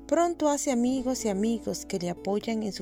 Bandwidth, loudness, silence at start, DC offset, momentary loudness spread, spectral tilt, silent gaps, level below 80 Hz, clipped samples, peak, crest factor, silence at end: 16.5 kHz; -28 LUFS; 0 s; under 0.1%; 6 LU; -4.5 dB/octave; none; -54 dBFS; under 0.1%; -14 dBFS; 14 dB; 0 s